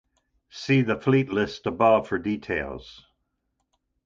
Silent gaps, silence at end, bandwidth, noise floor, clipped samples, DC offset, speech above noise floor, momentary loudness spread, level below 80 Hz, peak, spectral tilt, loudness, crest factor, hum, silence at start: none; 1.15 s; 7.6 kHz; -77 dBFS; under 0.1%; under 0.1%; 53 dB; 16 LU; -54 dBFS; -6 dBFS; -7 dB/octave; -24 LUFS; 18 dB; none; 0.55 s